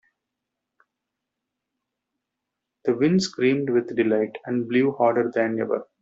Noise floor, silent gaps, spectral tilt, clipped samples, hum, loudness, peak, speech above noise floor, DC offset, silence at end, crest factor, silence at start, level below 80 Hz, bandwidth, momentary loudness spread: -83 dBFS; none; -5.5 dB/octave; under 0.1%; none; -23 LUFS; -6 dBFS; 61 dB; under 0.1%; 0.2 s; 20 dB; 2.85 s; -68 dBFS; 7.8 kHz; 6 LU